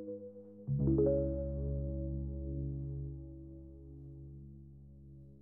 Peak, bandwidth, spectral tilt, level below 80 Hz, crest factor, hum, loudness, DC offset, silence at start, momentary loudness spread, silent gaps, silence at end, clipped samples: -20 dBFS; 1.6 kHz; -14.5 dB/octave; -46 dBFS; 18 dB; none; -37 LUFS; under 0.1%; 0 s; 24 LU; none; 0 s; under 0.1%